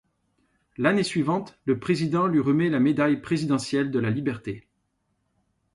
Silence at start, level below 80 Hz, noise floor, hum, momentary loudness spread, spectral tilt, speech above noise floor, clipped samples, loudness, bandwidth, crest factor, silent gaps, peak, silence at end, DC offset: 0.8 s; -60 dBFS; -74 dBFS; none; 7 LU; -6.5 dB/octave; 50 dB; under 0.1%; -24 LUFS; 11.5 kHz; 18 dB; none; -8 dBFS; 1.15 s; under 0.1%